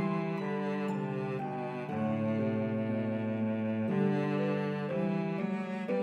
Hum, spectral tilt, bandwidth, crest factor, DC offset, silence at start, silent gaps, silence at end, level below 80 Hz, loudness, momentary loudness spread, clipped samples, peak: none; -9 dB/octave; 7.6 kHz; 12 dB; under 0.1%; 0 s; none; 0 s; -78 dBFS; -33 LUFS; 5 LU; under 0.1%; -20 dBFS